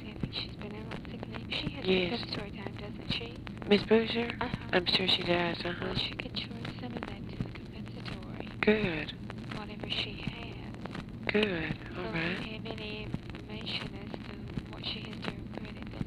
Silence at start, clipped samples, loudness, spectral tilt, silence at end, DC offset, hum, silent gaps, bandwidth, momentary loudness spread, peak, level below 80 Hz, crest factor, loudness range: 0 s; under 0.1%; -34 LUFS; -6 dB/octave; 0 s; under 0.1%; none; none; 12.5 kHz; 14 LU; -10 dBFS; -50 dBFS; 24 dB; 8 LU